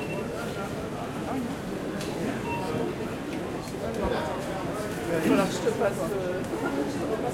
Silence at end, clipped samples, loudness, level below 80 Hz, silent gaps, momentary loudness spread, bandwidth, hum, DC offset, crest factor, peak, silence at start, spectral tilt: 0 s; under 0.1%; -30 LUFS; -50 dBFS; none; 8 LU; 16.5 kHz; none; under 0.1%; 20 dB; -10 dBFS; 0 s; -5.5 dB/octave